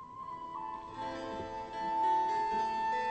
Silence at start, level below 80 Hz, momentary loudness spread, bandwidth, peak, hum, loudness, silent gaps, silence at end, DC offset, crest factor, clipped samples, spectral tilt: 0 s; -62 dBFS; 12 LU; 8.4 kHz; -22 dBFS; none; -35 LUFS; none; 0 s; under 0.1%; 12 dB; under 0.1%; -4.5 dB/octave